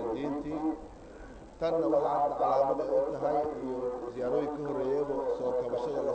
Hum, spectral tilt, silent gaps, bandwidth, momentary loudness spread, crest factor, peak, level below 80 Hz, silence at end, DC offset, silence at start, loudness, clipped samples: none; -7.5 dB/octave; none; 8.8 kHz; 10 LU; 16 dB; -16 dBFS; -56 dBFS; 0 s; under 0.1%; 0 s; -31 LUFS; under 0.1%